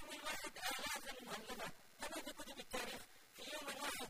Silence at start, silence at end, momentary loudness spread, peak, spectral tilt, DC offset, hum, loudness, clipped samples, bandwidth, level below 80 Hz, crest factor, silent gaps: 0 s; 0 s; 8 LU; -30 dBFS; -1 dB/octave; under 0.1%; none; -47 LUFS; under 0.1%; 15.5 kHz; -70 dBFS; 20 dB; none